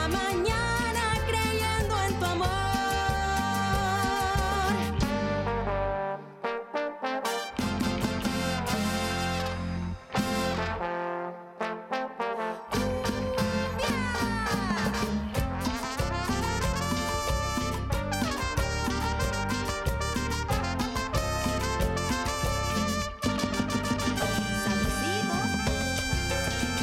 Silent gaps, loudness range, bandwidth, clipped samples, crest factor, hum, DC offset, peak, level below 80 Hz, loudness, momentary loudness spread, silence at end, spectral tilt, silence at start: none; 3 LU; 16 kHz; under 0.1%; 14 dB; none; under 0.1%; -14 dBFS; -38 dBFS; -29 LUFS; 5 LU; 0 s; -4.5 dB/octave; 0 s